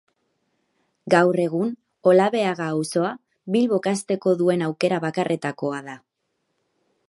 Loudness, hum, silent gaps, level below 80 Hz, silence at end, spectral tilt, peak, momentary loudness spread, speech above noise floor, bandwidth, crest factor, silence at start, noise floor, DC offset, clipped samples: -22 LUFS; none; none; -74 dBFS; 1.1 s; -6 dB/octave; -2 dBFS; 11 LU; 54 dB; 11.5 kHz; 22 dB; 1.05 s; -75 dBFS; under 0.1%; under 0.1%